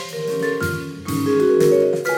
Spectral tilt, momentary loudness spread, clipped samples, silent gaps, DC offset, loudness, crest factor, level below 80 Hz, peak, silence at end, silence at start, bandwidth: -6 dB/octave; 10 LU; under 0.1%; none; under 0.1%; -19 LUFS; 14 dB; -52 dBFS; -6 dBFS; 0 s; 0 s; 17.5 kHz